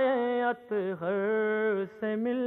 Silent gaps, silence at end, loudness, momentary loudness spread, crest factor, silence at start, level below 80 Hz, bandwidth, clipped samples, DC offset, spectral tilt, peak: none; 0 s; -30 LUFS; 5 LU; 12 dB; 0 s; -80 dBFS; 4.1 kHz; under 0.1%; under 0.1%; -8.5 dB/octave; -16 dBFS